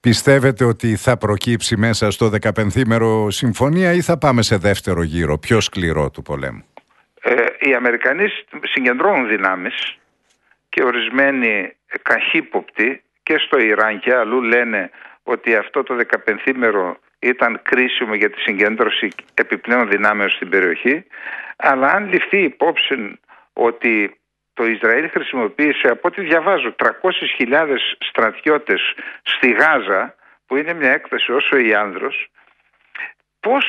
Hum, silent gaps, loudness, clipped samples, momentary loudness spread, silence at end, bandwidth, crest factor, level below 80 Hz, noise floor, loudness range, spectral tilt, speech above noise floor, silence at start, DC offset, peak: none; none; -16 LUFS; under 0.1%; 9 LU; 0 s; 12 kHz; 18 dB; -46 dBFS; -60 dBFS; 2 LU; -5 dB/octave; 44 dB; 0.05 s; under 0.1%; 0 dBFS